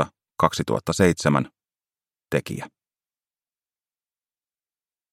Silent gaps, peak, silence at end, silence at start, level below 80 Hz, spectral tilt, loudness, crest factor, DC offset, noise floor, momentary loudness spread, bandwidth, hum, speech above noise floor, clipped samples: none; 0 dBFS; 2.45 s; 0 s; -56 dBFS; -5.5 dB/octave; -23 LUFS; 26 dB; under 0.1%; under -90 dBFS; 15 LU; 16 kHz; none; over 68 dB; under 0.1%